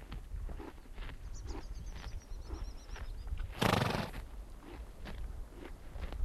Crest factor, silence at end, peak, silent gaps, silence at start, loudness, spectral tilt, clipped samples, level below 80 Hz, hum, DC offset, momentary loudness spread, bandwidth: 26 dB; 0 s; -14 dBFS; none; 0 s; -42 LUFS; -5 dB/octave; under 0.1%; -44 dBFS; none; under 0.1%; 18 LU; 13.5 kHz